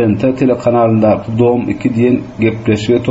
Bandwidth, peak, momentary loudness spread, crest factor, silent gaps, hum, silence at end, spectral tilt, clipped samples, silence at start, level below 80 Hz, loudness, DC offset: 7.8 kHz; -2 dBFS; 4 LU; 10 dB; none; none; 0 s; -7 dB/octave; under 0.1%; 0 s; -42 dBFS; -13 LUFS; under 0.1%